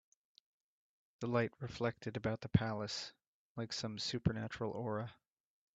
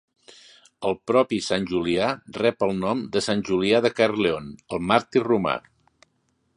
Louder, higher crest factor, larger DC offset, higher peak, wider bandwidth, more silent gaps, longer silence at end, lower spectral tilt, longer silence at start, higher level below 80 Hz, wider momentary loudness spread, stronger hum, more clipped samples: second, -40 LUFS vs -23 LUFS; about the same, 26 dB vs 22 dB; neither; second, -16 dBFS vs -2 dBFS; second, 8.2 kHz vs 11 kHz; first, 3.27-3.55 s vs none; second, 0.6 s vs 0.95 s; about the same, -5.5 dB/octave vs -5 dB/octave; first, 1.2 s vs 0.8 s; second, -64 dBFS vs -56 dBFS; first, 11 LU vs 8 LU; neither; neither